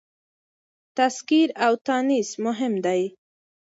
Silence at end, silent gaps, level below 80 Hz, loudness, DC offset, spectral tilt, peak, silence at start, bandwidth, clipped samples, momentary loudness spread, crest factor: 0.6 s; 1.81-1.85 s; -76 dBFS; -23 LUFS; under 0.1%; -4 dB/octave; -6 dBFS; 0.95 s; 8 kHz; under 0.1%; 6 LU; 18 dB